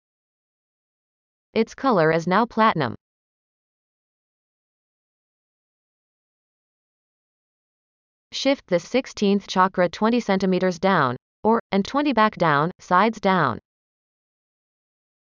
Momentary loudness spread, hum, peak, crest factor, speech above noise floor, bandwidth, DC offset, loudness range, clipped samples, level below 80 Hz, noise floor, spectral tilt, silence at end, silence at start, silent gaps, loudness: 6 LU; none; -4 dBFS; 20 dB; over 70 dB; 7.6 kHz; under 0.1%; 8 LU; under 0.1%; -62 dBFS; under -90 dBFS; -6 dB/octave; 1.75 s; 1.55 s; 3.01-8.31 s, 11.22-11.43 s, 11.60-11.70 s, 12.75-12.79 s; -21 LUFS